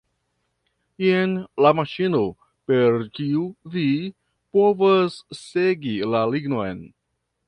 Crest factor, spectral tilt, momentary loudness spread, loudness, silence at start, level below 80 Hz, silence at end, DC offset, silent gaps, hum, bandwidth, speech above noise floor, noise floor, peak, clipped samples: 20 dB; -7.5 dB/octave; 11 LU; -22 LUFS; 1 s; -60 dBFS; 0.6 s; under 0.1%; none; none; 10.5 kHz; 52 dB; -73 dBFS; -2 dBFS; under 0.1%